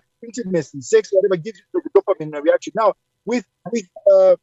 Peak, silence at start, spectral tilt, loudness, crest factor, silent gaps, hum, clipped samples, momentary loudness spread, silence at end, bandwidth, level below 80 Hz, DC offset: -2 dBFS; 0.2 s; -5.5 dB/octave; -19 LUFS; 16 dB; none; none; under 0.1%; 12 LU; 0.1 s; 8 kHz; -70 dBFS; under 0.1%